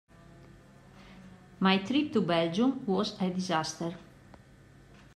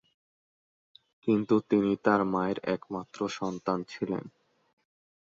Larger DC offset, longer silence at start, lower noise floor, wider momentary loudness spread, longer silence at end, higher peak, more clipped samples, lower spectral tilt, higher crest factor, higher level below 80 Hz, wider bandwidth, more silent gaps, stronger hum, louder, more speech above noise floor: neither; second, 0.4 s vs 1.25 s; second, -56 dBFS vs under -90 dBFS; first, 14 LU vs 9 LU; about the same, 1.1 s vs 1.1 s; about the same, -12 dBFS vs -10 dBFS; neither; second, -5.5 dB/octave vs -7 dB/octave; about the same, 20 dB vs 22 dB; about the same, -64 dBFS vs -68 dBFS; first, 11.5 kHz vs 7.8 kHz; neither; neither; about the same, -29 LUFS vs -30 LUFS; second, 27 dB vs over 61 dB